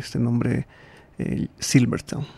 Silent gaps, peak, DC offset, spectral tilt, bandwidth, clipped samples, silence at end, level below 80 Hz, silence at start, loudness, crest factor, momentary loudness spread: none; -6 dBFS; under 0.1%; -5.5 dB/octave; 13.5 kHz; under 0.1%; 0 s; -48 dBFS; 0 s; -24 LUFS; 18 dB; 10 LU